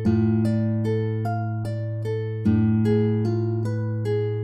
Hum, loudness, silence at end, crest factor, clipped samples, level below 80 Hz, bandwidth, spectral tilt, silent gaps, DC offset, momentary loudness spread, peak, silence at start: none; -24 LUFS; 0 s; 12 dB; under 0.1%; -50 dBFS; 5.8 kHz; -10 dB/octave; none; under 0.1%; 7 LU; -10 dBFS; 0 s